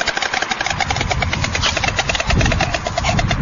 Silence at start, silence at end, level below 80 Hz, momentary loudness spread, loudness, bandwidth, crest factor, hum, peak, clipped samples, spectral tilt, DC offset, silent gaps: 0 s; 0 s; -26 dBFS; 3 LU; -18 LUFS; 7.6 kHz; 14 dB; none; -4 dBFS; under 0.1%; -3.5 dB/octave; under 0.1%; none